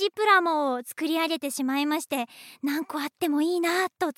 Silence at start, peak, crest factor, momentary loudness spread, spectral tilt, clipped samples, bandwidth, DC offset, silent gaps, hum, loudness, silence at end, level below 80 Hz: 0 s; -8 dBFS; 18 dB; 11 LU; -1.5 dB/octave; under 0.1%; 16.5 kHz; under 0.1%; none; none; -26 LUFS; 0.05 s; -86 dBFS